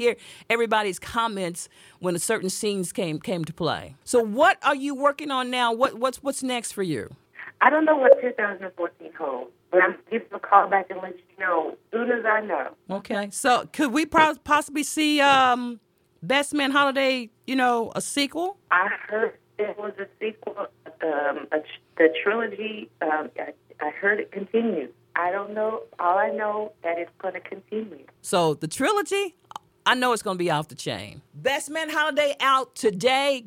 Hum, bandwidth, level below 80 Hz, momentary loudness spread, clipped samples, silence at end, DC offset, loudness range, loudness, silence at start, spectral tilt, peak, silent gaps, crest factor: none; 16.5 kHz; -64 dBFS; 14 LU; under 0.1%; 0 s; under 0.1%; 5 LU; -24 LUFS; 0 s; -3.5 dB/octave; 0 dBFS; none; 24 dB